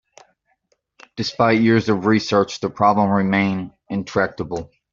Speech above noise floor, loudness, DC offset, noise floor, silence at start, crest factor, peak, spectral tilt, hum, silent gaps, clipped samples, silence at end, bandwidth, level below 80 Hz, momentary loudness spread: 49 dB; -19 LUFS; under 0.1%; -67 dBFS; 1.15 s; 18 dB; -2 dBFS; -6 dB/octave; none; none; under 0.1%; 0.25 s; 7.6 kHz; -54 dBFS; 12 LU